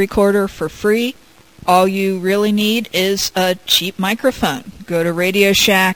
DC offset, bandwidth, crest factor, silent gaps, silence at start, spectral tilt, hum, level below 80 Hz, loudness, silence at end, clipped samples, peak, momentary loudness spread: 0.4%; 16 kHz; 16 dB; none; 0 s; -3.5 dB/octave; none; -44 dBFS; -15 LUFS; 0 s; under 0.1%; 0 dBFS; 8 LU